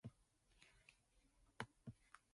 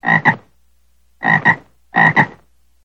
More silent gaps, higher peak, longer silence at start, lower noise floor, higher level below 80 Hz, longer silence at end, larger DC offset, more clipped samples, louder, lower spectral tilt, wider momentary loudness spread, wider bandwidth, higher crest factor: neither; second, -30 dBFS vs 0 dBFS; about the same, 0.05 s vs 0.05 s; first, -78 dBFS vs -59 dBFS; second, -78 dBFS vs -56 dBFS; second, 0.15 s vs 0.55 s; second, under 0.1% vs 0.2%; neither; second, -59 LUFS vs -14 LUFS; second, -5 dB/octave vs -6.5 dB/octave; first, 14 LU vs 10 LU; first, 11.5 kHz vs 7.8 kHz; first, 32 dB vs 18 dB